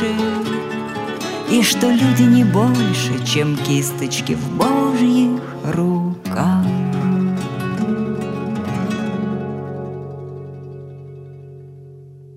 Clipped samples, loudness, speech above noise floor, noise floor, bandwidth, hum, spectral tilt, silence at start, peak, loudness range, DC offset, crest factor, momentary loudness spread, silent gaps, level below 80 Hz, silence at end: under 0.1%; -18 LUFS; 23 dB; -39 dBFS; 16 kHz; none; -5.5 dB/octave; 0 s; -2 dBFS; 10 LU; under 0.1%; 18 dB; 19 LU; none; -56 dBFS; 0 s